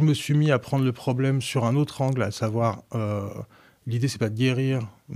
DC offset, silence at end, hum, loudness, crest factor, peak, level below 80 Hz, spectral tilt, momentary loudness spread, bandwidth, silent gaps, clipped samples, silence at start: under 0.1%; 0 s; none; -25 LUFS; 16 dB; -8 dBFS; -62 dBFS; -6.5 dB/octave; 9 LU; 14.5 kHz; none; under 0.1%; 0 s